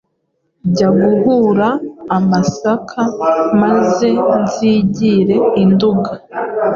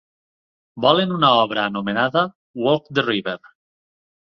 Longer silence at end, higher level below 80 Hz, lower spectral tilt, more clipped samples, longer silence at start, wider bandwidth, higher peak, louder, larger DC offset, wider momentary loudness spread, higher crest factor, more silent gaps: second, 0 s vs 0.95 s; first, -50 dBFS vs -62 dBFS; about the same, -7 dB/octave vs -7 dB/octave; neither; about the same, 0.65 s vs 0.75 s; first, 7.4 kHz vs 6.6 kHz; about the same, -2 dBFS vs -2 dBFS; first, -13 LUFS vs -19 LUFS; neither; about the same, 7 LU vs 9 LU; second, 10 dB vs 20 dB; second, none vs 2.35-2.54 s